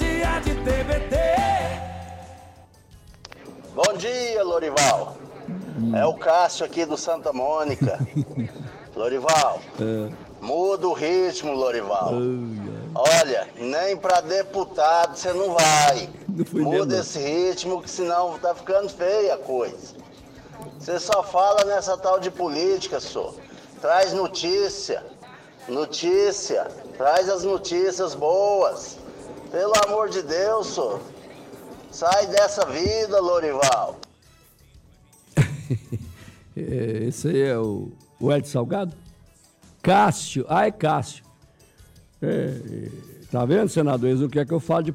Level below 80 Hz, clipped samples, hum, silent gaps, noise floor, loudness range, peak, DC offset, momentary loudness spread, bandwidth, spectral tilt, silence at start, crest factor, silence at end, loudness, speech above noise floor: -42 dBFS; under 0.1%; none; none; -54 dBFS; 5 LU; -10 dBFS; under 0.1%; 16 LU; 16 kHz; -4.5 dB/octave; 0 s; 14 dB; 0 s; -23 LUFS; 32 dB